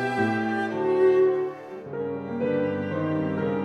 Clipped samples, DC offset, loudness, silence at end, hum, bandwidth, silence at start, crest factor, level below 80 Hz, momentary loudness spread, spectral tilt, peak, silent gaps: under 0.1%; under 0.1%; -25 LUFS; 0 s; none; 8.4 kHz; 0 s; 14 dB; -66 dBFS; 12 LU; -8 dB/octave; -10 dBFS; none